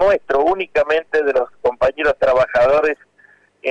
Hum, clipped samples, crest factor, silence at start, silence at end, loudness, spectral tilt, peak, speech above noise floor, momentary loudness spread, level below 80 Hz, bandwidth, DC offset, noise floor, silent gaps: 50 Hz at -60 dBFS; under 0.1%; 8 dB; 0 s; 0 s; -17 LUFS; -5 dB/octave; -8 dBFS; 37 dB; 7 LU; -44 dBFS; 8.4 kHz; under 0.1%; -53 dBFS; none